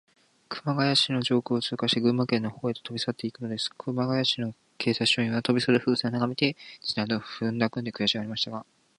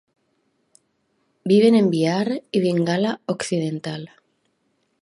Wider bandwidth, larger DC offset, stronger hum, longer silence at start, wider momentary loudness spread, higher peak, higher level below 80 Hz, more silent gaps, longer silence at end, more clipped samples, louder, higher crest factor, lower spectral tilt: about the same, 11 kHz vs 11.5 kHz; neither; neither; second, 0.5 s vs 1.45 s; second, 8 LU vs 16 LU; second, -8 dBFS vs -4 dBFS; about the same, -68 dBFS vs -70 dBFS; neither; second, 0.35 s vs 1 s; neither; second, -27 LUFS vs -20 LUFS; about the same, 20 dB vs 18 dB; second, -5 dB/octave vs -6.5 dB/octave